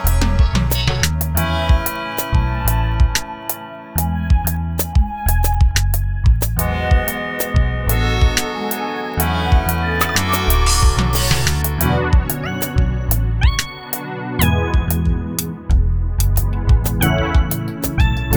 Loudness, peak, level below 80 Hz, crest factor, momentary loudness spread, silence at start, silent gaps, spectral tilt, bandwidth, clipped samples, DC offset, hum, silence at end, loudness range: -18 LUFS; 0 dBFS; -20 dBFS; 16 dB; 6 LU; 0 s; none; -4.5 dB/octave; over 20 kHz; under 0.1%; under 0.1%; none; 0 s; 2 LU